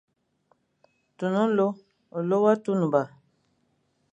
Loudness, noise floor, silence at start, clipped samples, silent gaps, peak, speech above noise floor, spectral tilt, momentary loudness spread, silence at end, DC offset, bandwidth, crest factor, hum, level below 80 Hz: -25 LUFS; -71 dBFS; 1.2 s; under 0.1%; none; -8 dBFS; 47 dB; -8 dB/octave; 15 LU; 1.05 s; under 0.1%; 8.4 kHz; 20 dB; none; -78 dBFS